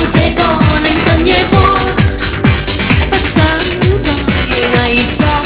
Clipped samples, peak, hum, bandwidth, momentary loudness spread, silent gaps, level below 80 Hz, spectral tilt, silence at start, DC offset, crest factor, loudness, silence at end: 0.4%; 0 dBFS; none; 4 kHz; 4 LU; none; -20 dBFS; -10 dB/octave; 0 s; under 0.1%; 10 dB; -11 LUFS; 0 s